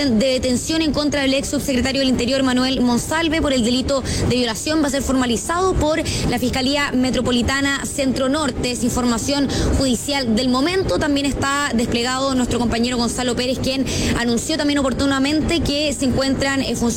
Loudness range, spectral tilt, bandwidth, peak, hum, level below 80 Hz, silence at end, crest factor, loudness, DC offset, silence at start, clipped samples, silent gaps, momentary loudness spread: 1 LU; -4 dB/octave; 16.5 kHz; -8 dBFS; none; -34 dBFS; 0 s; 10 dB; -19 LUFS; under 0.1%; 0 s; under 0.1%; none; 2 LU